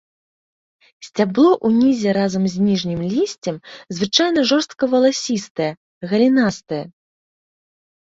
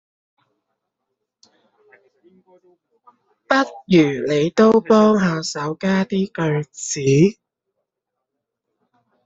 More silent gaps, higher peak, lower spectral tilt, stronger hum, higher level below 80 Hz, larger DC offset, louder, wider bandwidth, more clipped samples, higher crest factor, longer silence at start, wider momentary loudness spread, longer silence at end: first, 5.50-5.55 s, 5.77-6.01 s vs none; about the same, -2 dBFS vs -2 dBFS; about the same, -5 dB/octave vs -6 dB/octave; neither; about the same, -58 dBFS vs -60 dBFS; neither; about the same, -18 LUFS vs -18 LUFS; about the same, 8 kHz vs 8 kHz; neither; about the same, 18 dB vs 18 dB; second, 1 s vs 3.5 s; first, 13 LU vs 10 LU; second, 1.25 s vs 1.95 s